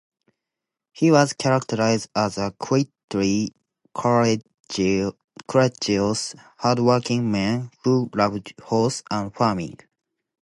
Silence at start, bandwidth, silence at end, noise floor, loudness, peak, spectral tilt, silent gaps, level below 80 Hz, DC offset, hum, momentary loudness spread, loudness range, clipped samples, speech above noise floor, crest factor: 0.95 s; 11.5 kHz; 0.7 s; -85 dBFS; -22 LUFS; -2 dBFS; -5.5 dB/octave; 3.04-3.08 s, 4.60-4.64 s, 5.24-5.28 s; -56 dBFS; under 0.1%; none; 9 LU; 2 LU; under 0.1%; 64 dB; 20 dB